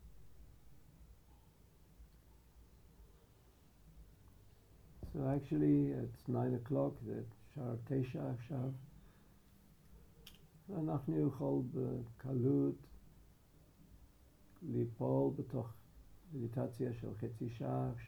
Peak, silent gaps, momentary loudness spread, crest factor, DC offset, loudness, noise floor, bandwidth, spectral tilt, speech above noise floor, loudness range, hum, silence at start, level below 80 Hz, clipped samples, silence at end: -24 dBFS; none; 18 LU; 18 dB; under 0.1%; -40 LUFS; -66 dBFS; over 20 kHz; -10 dB/octave; 27 dB; 7 LU; none; 0 s; -64 dBFS; under 0.1%; 0 s